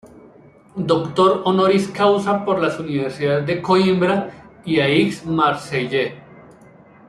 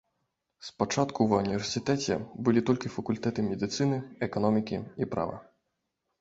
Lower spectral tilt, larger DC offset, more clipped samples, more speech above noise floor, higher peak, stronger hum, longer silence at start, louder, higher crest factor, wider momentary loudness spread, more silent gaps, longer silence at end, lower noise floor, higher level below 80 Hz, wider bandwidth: about the same, -6.5 dB/octave vs -5.5 dB/octave; neither; neither; second, 29 dB vs 53 dB; first, -2 dBFS vs -10 dBFS; neither; second, 0.05 s vs 0.6 s; first, -18 LUFS vs -29 LUFS; about the same, 16 dB vs 20 dB; about the same, 8 LU vs 8 LU; neither; second, 0.65 s vs 0.8 s; second, -47 dBFS vs -82 dBFS; about the same, -56 dBFS vs -60 dBFS; first, 12 kHz vs 8 kHz